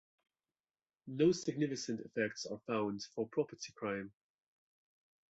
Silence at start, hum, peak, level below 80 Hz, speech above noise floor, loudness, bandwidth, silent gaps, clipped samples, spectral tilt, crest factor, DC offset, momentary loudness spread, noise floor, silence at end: 1.05 s; none; -20 dBFS; -78 dBFS; over 53 dB; -38 LUFS; 8 kHz; none; under 0.1%; -5 dB/octave; 20 dB; under 0.1%; 12 LU; under -90 dBFS; 1.2 s